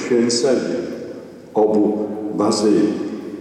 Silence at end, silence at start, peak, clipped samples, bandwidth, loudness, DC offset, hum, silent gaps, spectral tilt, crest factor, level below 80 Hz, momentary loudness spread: 0 s; 0 s; -6 dBFS; under 0.1%; 11.5 kHz; -19 LUFS; under 0.1%; none; none; -4.5 dB/octave; 12 dB; -64 dBFS; 13 LU